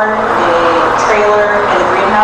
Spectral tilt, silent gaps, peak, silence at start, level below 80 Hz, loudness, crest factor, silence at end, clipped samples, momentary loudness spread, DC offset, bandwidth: -4 dB/octave; none; 0 dBFS; 0 s; -38 dBFS; -10 LUFS; 10 dB; 0 s; under 0.1%; 2 LU; under 0.1%; 10.5 kHz